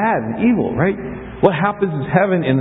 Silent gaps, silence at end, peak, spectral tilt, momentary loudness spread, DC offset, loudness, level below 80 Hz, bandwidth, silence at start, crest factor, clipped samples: none; 0 s; 0 dBFS; -11 dB/octave; 5 LU; under 0.1%; -17 LUFS; -44 dBFS; 4 kHz; 0 s; 16 dB; under 0.1%